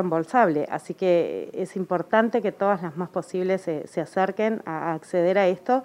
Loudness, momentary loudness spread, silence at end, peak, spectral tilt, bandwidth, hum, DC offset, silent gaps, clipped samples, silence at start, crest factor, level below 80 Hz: -24 LUFS; 9 LU; 0 s; -4 dBFS; -7 dB/octave; 11.5 kHz; none; under 0.1%; none; under 0.1%; 0 s; 20 dB; -76 dBFS